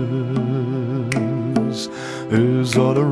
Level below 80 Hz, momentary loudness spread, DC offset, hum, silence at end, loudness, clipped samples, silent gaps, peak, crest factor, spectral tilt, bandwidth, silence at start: -54 dBFS; 8 LU; under 0.1%; none; 0 s; -20 LUFS; under 0.1%; none; -4 dBFS; 16 dB; -6.5 dB/octave; 11 kHz; 0 s